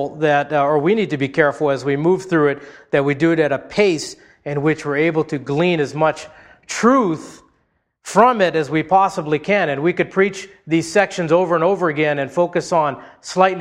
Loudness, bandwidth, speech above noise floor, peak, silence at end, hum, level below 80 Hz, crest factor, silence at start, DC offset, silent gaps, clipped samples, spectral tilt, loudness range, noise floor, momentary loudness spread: -18 LUFS; 12 kHz; 48 dB; 0 dBFS; 0 s; none; -56 dBFS; 18 dB; 0 s; under 0.1%; none; under 0.1%; -5.5 dB/octave; 2 LU; -66 dBFS; 7 LU